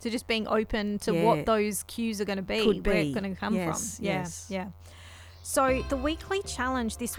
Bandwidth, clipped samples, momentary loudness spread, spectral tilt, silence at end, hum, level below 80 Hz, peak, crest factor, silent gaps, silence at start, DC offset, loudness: 19.5 kHz; under 0.1%; 11 LU; -4.5 dB/octave; 0 s; none; -44 dBFS; -10 dBFS; 20 dB; none; 0 s; under 0.1%; -28 LUFS